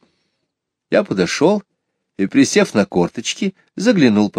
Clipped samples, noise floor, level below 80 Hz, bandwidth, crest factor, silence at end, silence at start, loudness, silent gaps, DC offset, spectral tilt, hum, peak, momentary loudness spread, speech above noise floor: under 0.1%; -76 dBFS; -58 dBFS; 13 kHz; 16 dB; 0 s; 0.9 s; -17 LUFS; none; under 0.1%; -5 dB/octave; none; 0 dBFS; 9 LU; 61 dB